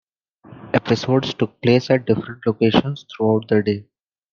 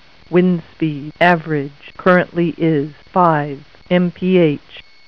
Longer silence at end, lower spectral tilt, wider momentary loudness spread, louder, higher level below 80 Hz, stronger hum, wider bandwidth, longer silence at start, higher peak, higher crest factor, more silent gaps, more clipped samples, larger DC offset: first, 0.5 s vs 0.25 s; second, -7 dB/octave vs -9 dB/octave; about the same, 7 LU vs 8 LU; second, -19 LUFS vs -16 LUFS; about the same, -54 dBFS vs -52 dBFS; neither; first, 7.2 kHz vs 5.4 kHz; first, 0.5 s vs 0.3 s; about the same, 0 dBFS vs 0 dBFS; about the same, 20 dB vs 16 dB; neither; neither; second, under 0.1% vs 0.5%